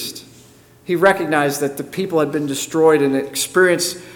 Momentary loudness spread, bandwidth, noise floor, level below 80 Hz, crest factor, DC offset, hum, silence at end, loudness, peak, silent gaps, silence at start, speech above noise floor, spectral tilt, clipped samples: 10 LU; 19 kHz; -47 dBFS; -60 dBFS; 16 dB; under 0.1%; none; 0 s; -17 LUFS; -2 dBFS; none; 0 s; 30 dB; -4 dB/octave; under 0.1%